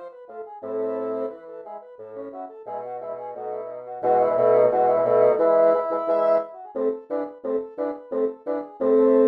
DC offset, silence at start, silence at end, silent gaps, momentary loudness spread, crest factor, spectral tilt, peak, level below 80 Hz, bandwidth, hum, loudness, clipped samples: under 0.1%; 0 s; 0 s; none; 20 LU; 16 dB; -9 dB/octave; -6 dBFS; -72 dBFS; 4.9 kHz; none; -23 LUFS; under 0.1%